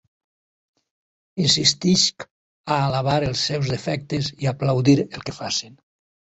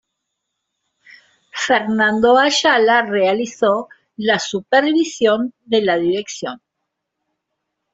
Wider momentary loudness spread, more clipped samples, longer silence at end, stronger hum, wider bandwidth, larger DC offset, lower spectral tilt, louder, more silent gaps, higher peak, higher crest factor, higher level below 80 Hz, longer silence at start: about the same, 13 LU vs 11 LU; neither; second, 0.65 s vs 1.35 s; neither; about the same, 8.2 kHz vs 8.2 kHz; neither; about the same, -4.5 dB/octave vs -3.5 dB/octave; second, -21 LUFS vs -16 LUFS; first, 2.31-2.64 s vs none; about the same, -2 dBFS vs -2 dBFS; about the same, 20 dB vs 16 dB; first, -52 dBFS vs -62 dBFS; second, 1.35 s vs 1.55 s